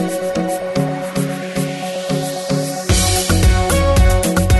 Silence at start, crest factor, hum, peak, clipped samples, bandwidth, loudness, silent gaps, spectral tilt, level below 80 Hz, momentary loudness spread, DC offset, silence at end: 0 s; 12 dB; none; -4 dBFS; under 0.1%; 12.5 kHz; -17 LUFS; none; -4.5 dB/octave; -22 dBFS; 8 LU; under 0.1%; 0 s